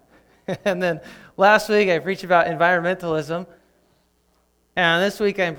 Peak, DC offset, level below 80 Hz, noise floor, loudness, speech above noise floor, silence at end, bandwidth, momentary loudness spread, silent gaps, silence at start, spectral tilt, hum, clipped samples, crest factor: -2 dBFS; under 0.1%; -58 dBFS; -64 dBFS; -20 LUFS; 44 dB; 0 s; 19.5 kHz; 14 LU; none; 0.5 s; -5 dB/octave; none; under 0.1%; 20 dB